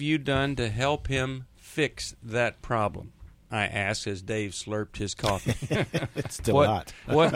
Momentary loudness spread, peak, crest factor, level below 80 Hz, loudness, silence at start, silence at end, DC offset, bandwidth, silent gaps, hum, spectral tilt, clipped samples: 9 LU; -8 dBFS; 20 dB; -46 dBFS; -28 LUFS; 0 s; 0 s; under 0.1%; 16 kHz; none; none; -5 dB/octave; under 0.1%